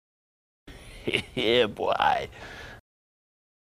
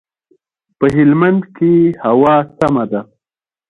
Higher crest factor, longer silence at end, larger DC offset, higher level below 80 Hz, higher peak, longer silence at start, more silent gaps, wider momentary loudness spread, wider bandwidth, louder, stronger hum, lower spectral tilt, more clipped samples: first, 24 dB vs 14 dB; first, 0.95 s vs 0.65 s; neither; second, -54 dBFS vs -48 dBFS; second, -6 dBFS vs 0 dBFS; second, 0.65 s vs 0.8 s; neither; first, 20 LU vs 7 LU; first, 15 kHz vs 9.8 kHz; second, -26 LUFS vs -13 LUFS; neither; second, -4.5 dB/octave vs -9 dB/octave; neither